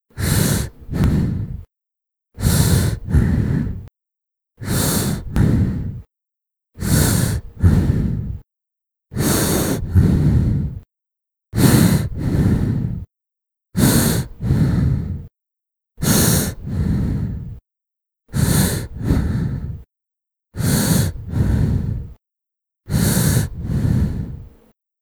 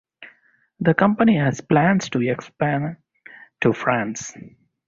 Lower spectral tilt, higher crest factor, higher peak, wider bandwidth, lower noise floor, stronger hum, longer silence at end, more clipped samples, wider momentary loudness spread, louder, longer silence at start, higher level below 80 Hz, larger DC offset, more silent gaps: about the same, -5.5 dB/octave vs -6.5 dB/octave; about the same, 20 dB vs 20 dB; about the same, 0 dBFS vs -2 dBFS; first, over 20 kHz vs 7.6 kHz; first, -84 dBFS vs -59 dBFS; neither; first, 0.55 s vs 0.4 s; neither; about the same, 15 LU vs 13 LU; about the same, -19 LUFS vs -20 LUFS; about the same, 0.15 s vs 0.2 s; first, -28 dBFS vs -56 dBFS; neither; neither